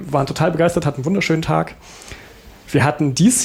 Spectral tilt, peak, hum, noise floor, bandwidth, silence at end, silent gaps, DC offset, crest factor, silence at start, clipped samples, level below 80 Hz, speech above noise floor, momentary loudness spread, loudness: -5 dB/octave; -4 dBFS; none; -42 dBFS; 16 kHz; 0 s; none; under 0.1%; 14 dB; 0 s; under 0.1%; -44 dBFS; 24 dB; 20 LU; -18 LUFS